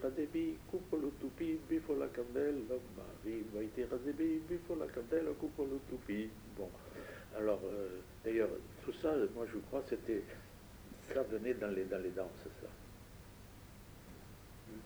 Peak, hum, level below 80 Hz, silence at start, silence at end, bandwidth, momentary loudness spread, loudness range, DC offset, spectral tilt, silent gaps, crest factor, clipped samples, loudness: -22 dBFS; none; -60 dBFS; 0 s; 0 s; over 20 kHz; 18 LU; 3 LU; under 0.1%; -6.5 dB/octave; none; 18 dB; under 0.1%; -41 LUFS